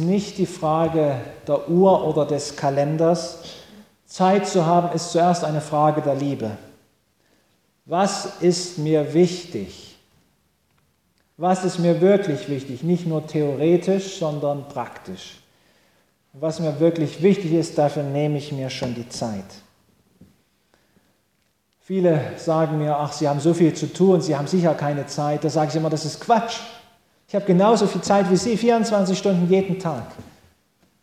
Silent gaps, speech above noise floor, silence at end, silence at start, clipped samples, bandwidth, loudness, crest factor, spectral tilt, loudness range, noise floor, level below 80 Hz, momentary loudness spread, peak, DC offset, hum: none; 47 dB; 0.8 s; 0 s; under 0.1%; 14.5 kHz; -21 LUFS; 16 dB; -6.5 dB/octave; 6 LU; -67 dBFS; -60 dBFS; 12 LU; -4 dBFS; under 0.1%; none